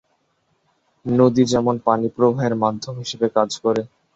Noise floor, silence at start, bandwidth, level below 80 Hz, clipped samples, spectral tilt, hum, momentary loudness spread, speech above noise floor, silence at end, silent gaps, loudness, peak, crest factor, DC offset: -67 dBFS; 1.05 s; 8 kHz; -56 dBFS; under 0.1%; -6.5 dB/octave; none; 9 LU; 48 dB; 0.3 s; none; -19 LUFS; -2 dBFS; 18 dB; under 0.1%